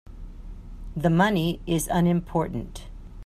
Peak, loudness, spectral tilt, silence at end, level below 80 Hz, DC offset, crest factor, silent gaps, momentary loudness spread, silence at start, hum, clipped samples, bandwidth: -8 dBFS; -24 LUFS; -6 dB/octave; 0 s; -40 dBFS; under 0.1%; 18 dB; none; 23 LU; 0.05 s; none; under 0.1%; 15 kHz